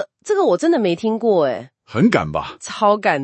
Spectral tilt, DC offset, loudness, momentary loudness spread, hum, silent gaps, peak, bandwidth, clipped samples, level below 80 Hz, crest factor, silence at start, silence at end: -6 dB/octave; under 0.1%; -18 LUFS; 10 LU; none; none; 0 dBFS; 8.8 kHz; under 0.1%; -54 dBFS; 18 dB; 0 s; 0 s